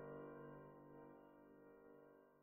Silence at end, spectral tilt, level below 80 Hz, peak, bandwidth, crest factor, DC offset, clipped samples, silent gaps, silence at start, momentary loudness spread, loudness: 0 s; -4.5 dB/octave; -84 dBFS; -44 dBFS; 3.3 kHz; 16 dB; under 0.1%; under 0.1%; none; 0 s; 10 LU; -61 LUFS